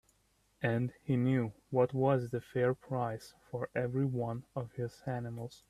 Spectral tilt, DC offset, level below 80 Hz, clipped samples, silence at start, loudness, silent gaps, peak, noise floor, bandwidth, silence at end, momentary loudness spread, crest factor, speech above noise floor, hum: -8.5 dB/octave; under 0.1%; -66 dBFS; under 0.1%; 0.6 s; -35 LUFS; none; -16 dBFS; -73 dBFS; 13 kHz; 0.15 s; 10 LU; 18 dB; 39 dB; none